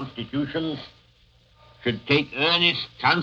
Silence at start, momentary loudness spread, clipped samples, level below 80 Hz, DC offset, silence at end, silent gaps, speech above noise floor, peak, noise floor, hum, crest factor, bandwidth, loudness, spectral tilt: 0 s; 12 LU; under 0.1%; -58 dBFS; under 0.1%; 0 s; none; 34 dB; -6 dBFS; -58 dBFS; none; 20 dB; 7.4 kHz; -23 LUFS; -6 dB/octave